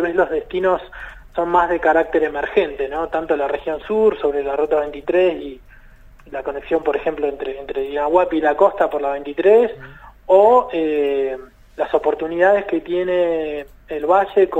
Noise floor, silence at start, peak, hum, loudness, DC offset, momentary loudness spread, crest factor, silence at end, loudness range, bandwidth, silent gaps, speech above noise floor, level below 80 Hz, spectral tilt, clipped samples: -44 dBFS; 0 s; 0 dBFS; none; -18 LUFS; under 0.1%; 13 LU; 18 dB; 0 s; 5 LU; 8 kHz; none; 26 dB; -46 dBFS; -6.5 dB/octave; under 0.1%